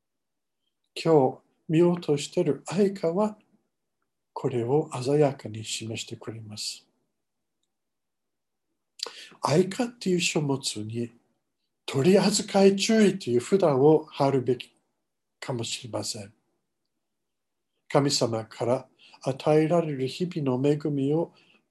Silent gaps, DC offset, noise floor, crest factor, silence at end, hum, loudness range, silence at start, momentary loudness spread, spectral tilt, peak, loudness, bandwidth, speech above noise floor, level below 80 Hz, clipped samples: none; under 0.1%; -87 dBFS; 20 dB; 0.45 s; none; 11 LU; 0.95 s; 15 LU; -5.5 dB/octave; -6 dBFS; -25 LUFS; 12.5 kHz; 62 dB; -70 dBFS; under 0.1%